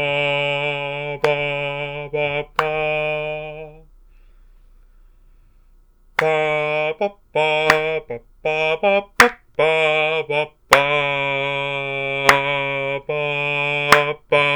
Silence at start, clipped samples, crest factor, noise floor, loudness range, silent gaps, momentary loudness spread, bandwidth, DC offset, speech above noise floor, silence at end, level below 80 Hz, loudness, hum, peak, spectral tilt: 0 s; under 0.1%; 20 dB; -51 dBFS; 9 LU; none; 10 LU; over 20 kHz; under 0.1%; 32 dB; 0 s; -48 dBFS; -19 LUFS; none; 0 dBFS; -3.5 dB/octave